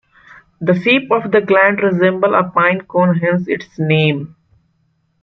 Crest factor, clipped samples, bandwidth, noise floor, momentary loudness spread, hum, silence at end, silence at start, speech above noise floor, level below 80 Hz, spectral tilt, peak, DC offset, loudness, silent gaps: 14 dB; under 0.1%; 6.2 kHz; -62 dBFS; 8 LU; none; 0.95 s; 0.6 s; 48 dB; -58 dBFS; -8.5 dB/octave; 0 dBFS; under 0.1%; -14 LUFS; none